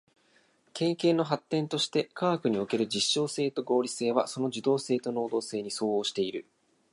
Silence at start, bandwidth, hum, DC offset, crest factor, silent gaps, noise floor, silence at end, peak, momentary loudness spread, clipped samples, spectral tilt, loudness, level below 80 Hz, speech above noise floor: 0.75 s; 11.5 kHz; none; under 0.1%; 18 dB; none; -66 dBFS; 0.5 s; -10 dBFS; 5 LU; under 0.1%; -4.5 dB/octave; -29 LUFS; -76 dBFS; 37 dB